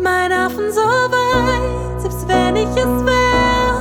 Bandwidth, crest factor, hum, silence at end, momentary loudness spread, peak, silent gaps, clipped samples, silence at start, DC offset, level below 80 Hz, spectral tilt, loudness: 19 kHz; 12 dB; none; 0 s; 7 LU; -4 dBFS; none; under 0.1%; 0 s; under 0.1%; -28 dBFS; -5 dB/octave; -16 LUFS